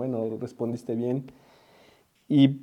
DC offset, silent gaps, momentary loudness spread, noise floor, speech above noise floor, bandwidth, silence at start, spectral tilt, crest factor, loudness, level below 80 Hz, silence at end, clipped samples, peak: under 0.1%; none; 12 LU; -60 dBFS; 34 dB; 8.8 kHz; 0 s; -8.5 dB/octave; 20 dB; -28 LUFS; -74 dBFS; 0 s; under 0.1%; -6 dBFS